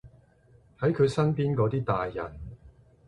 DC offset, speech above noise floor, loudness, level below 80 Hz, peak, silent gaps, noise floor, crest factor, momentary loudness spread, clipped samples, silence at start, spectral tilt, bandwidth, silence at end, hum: under 0.1%; 33 dB; -27 LUFS; -52 dBFS; -12 dBFS; none; -59 dBFS; 18 dB; 16 LU; under 0.1%; 0.05 s; -8 dB/octave; 11 kHz; 0.4 s; none